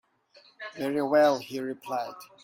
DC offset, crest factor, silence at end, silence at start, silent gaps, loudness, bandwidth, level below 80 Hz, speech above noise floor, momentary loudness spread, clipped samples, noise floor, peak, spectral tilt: under 0.1%; 18 dB; 0.2 s; 0.6 s; none; -27 LUFS; 16.5 kHz; -76 dBFS; 32 dB; 18 LU; under 0.1%; -60 dBFS; -10 dBFS; -5 dB/octave